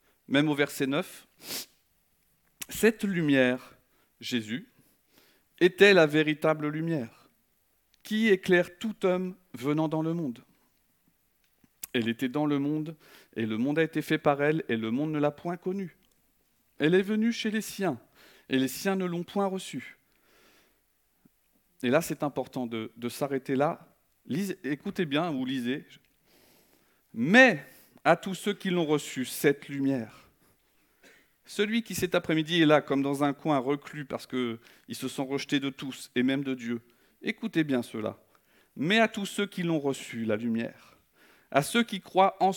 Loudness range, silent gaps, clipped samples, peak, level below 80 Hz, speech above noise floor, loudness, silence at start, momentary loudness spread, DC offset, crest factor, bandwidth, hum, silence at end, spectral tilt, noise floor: 7 LU; none; under 0.1%; -6 dBFS; -70 dBFS; 44 dB; -28 LUFS; 0.3 s; 13 LU; under 0.1%; 24 dB; 19 kHz; none; 0 s; -5 dB/octave; -71 dBFS